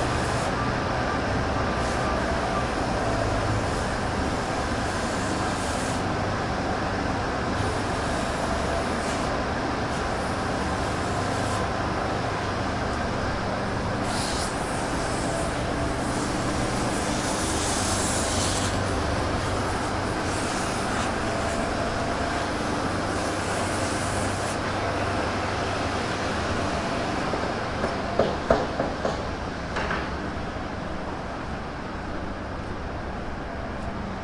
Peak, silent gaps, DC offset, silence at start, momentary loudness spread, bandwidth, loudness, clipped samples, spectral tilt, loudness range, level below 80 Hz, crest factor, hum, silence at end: -6 dBFS; none; under 0.1%; 0 s; 7 LU; 11.5 kHz; -27 LUFS; under 0.1%; -4.5 dB/octave; 3 LU; -38 dBFS; 22 dB; none; 0 s